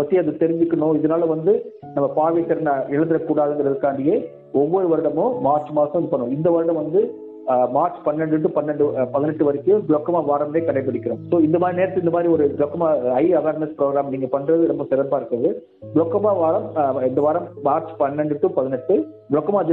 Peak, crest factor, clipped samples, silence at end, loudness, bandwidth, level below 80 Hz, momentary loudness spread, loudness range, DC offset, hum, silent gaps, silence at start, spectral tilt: -4 dBFS; 14 dB; under 0.1%; 0 s; -20 LUFS; 4 kHz; -62 dBFS; 4 LU; 1 LU; under 0.1%; none; none; 0 s; -12 dB/octave